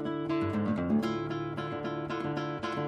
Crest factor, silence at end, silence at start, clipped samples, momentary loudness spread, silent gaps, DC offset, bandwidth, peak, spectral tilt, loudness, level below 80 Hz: 14 dB; 0 s; 0 s; under 0.1%; 6 LU; none; under 0.1%; 9.8 kHz; -18 dBFS; -7.5 dB/octave; -32 LUFS; -60 dBFS